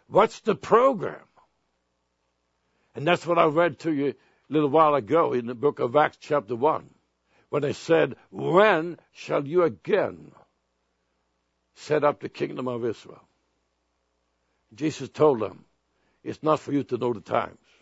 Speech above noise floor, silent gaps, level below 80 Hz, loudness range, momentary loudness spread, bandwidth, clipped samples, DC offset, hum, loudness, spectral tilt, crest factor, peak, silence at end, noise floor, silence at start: 51 dB; none; -70 dBFS; 7 LU; 12 LU; 8 kHz; under 0.1%; under 0.1%; none; -24 LUFS; -6.5 dB/octave; 22 dB; -4 dBFS; 0.3 s; -75 dBFS; 0.1 s